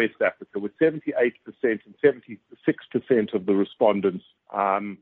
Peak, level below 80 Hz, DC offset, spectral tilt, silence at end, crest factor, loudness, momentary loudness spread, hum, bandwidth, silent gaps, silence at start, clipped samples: -6 dBFS; -70 dBFS; under 0.1%; -5 dB/octave; 0.05 s; 18 dB; -24 LUFS; 11 LU; none; 4.1 kHz; none; 0 s; under 0.1%